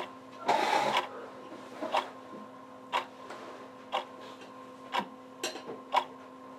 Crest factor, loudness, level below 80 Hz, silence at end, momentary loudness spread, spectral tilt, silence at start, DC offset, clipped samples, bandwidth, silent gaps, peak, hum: 22 dB; -34 LUFS; -82 dBFS; 0 s; 19 LU; -2.5 dB/octave; 0 s; under 0.1%; under 0.1%; 16 kHz; none; -14 dBFS; none